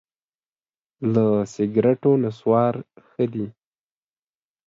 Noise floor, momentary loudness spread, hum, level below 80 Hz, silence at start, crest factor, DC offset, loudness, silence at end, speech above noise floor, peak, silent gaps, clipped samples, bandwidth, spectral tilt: under -90 dBFS; 13 LU; none; -64 dBFS; 1 s; 18 dB; under 0.1%; -21 LUFS; 1.15 s; over 70 dB; -6 dBFS; none; under 0.1%; 7.6 kHz; -9 dB/octave